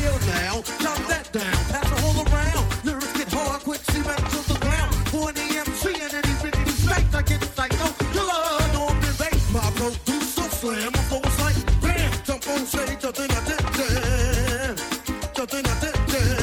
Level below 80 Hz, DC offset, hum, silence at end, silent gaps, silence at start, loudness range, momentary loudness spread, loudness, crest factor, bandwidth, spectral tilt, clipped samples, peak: -28 dBFS; under 0.1%; none; 0 s; none; 0 s; 2 LU; 4 LU; -24 LUFS; 16 dB; 19 kHz; -4.5 dB/octave; under 0.1%; -8 dBFS